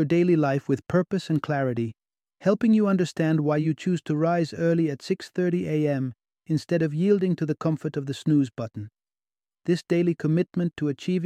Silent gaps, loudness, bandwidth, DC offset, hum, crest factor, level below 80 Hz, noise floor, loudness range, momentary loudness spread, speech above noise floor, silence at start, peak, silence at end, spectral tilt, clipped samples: none; -25 LUFS; 10 kHz; under 0.1%; none; 16 dB; -66 dBFS; under -90 dBFS; 3 LU; 9 LU; over 66 dB; 0 s; -8 dBFS; 0 s; -8 dB/octave; under 0.1%